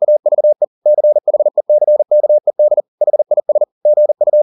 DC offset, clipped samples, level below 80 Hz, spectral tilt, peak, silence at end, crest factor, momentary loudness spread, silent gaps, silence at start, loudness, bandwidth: under 0.1%; under 0.1%; -80 dBFS; -11.5 dB/octave; -4 dBFS; 0 s; 8 dB; 3 LU; 0.67-0.82 s, 2.88-2.98 s, 3.72-3.81 s; 0 s; -13 LUFS; 1.1 kHz